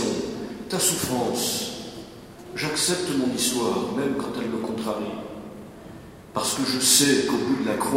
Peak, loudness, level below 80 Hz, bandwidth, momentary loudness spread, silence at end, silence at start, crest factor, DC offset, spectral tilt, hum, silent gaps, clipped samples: -4 dBFS; -23 LUFS; -56 dBFS; 16 kHz; 21 LU; 0 s; 0 s; 20 dB; under 0.1%; -2.5 dB/octave; none; none; under 0.1%